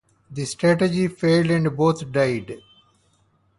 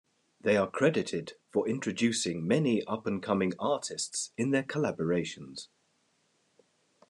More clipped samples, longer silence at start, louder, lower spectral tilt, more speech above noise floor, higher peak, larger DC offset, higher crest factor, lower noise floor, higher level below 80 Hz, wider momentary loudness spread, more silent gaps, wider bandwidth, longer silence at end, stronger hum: neither; second, 0.3 s vs 0.45 s; first, -21 LUFS vs -30 LUFS; first, -6.5 dB/octave vs -5 dB/octave; about the same, 43 dB vs 42 dB; first, -6 dBFS vs -12 dBFS; neither; about the same, 18 dB vs 18 dB; second, -63 dBFS vs -73 dBFS; first, -56 dBFS vs -72 dBFS; first, 15 LU vs 10 LU; neither; about the same, 11.5 kHz vs 12 kHz; second, 1 s vs 1.45 s; neither